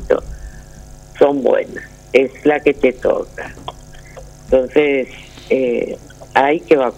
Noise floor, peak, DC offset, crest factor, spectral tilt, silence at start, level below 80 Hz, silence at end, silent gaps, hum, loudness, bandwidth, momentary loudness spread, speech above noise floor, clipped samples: -37 dBFS; 0 dBFS; under 0.1%; 16 dB; -5.5 dB/octave; 0 s; -38 dBFS; 0.05 s; none; none; -16 LUFS; 11.5 kHz; 21 LU; 21 dB; under 0.1%